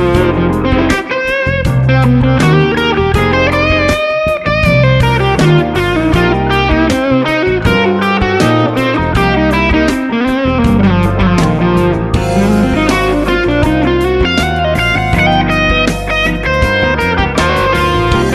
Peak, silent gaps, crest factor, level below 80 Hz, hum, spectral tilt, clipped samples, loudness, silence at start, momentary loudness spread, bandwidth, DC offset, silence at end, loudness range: 0 dBFS; none; 10 dB; -22 dBFS; none; -6.5 dB/octave; under 0.1%; -11 LUFS; 0 s; 3 LU; 13.5 kHz; under 0.1%; 0 s; 1 LU